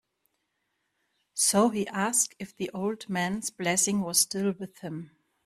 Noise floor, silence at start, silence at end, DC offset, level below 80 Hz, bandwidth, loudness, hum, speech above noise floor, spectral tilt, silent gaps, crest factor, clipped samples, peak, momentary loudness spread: -78 dBFS; 1.35 s; 0.4 s; under 0.1%; -68 dBFS; 15.5 kHz; -27 LUFS; none; 50 dB; -3 dB/octave; none; 20 dB; under 0.1%; -10 dBFS; 14 LU